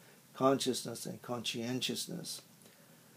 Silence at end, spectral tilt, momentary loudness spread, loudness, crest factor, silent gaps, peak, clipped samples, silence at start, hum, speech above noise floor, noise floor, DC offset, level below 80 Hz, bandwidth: 0.2 s; -4 dB/octave; 13 LU; -36 LUFS; 22 dB; none; -16 dBFS; under 0.1%; 0 s; none; 24 dB; -60 dBFS; under 0.1%; -88 dBFS; 15.5 kHz